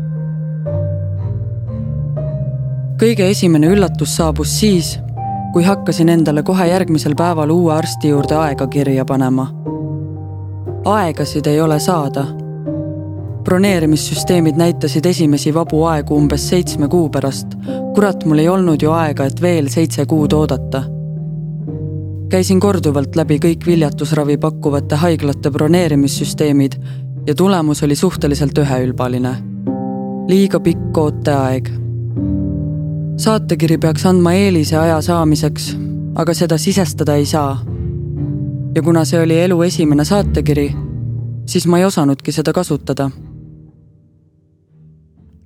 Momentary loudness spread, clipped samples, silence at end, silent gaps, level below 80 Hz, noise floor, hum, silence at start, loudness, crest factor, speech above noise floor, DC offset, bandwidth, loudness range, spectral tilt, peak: 10 LU; under 0.1%; 1.8 s; none; -34 dBFS; -53 dBFS; none; 0 s; -15 LUFS; 14 dB; 39 dB; under 0.1%; 16 kHz; 3 LU; -6.5 dB/octave; 0 dBFS